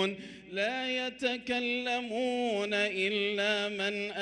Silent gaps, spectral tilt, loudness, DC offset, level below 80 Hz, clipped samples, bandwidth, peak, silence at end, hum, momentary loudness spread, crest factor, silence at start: none; -3.5 dB/octave; -31 LUFS; under 0.1%; -72 dBFS; under 0.1%; 11.5 kHz; -16 dBFS; 0 s; none; 4 LU; 16 dB; 0 s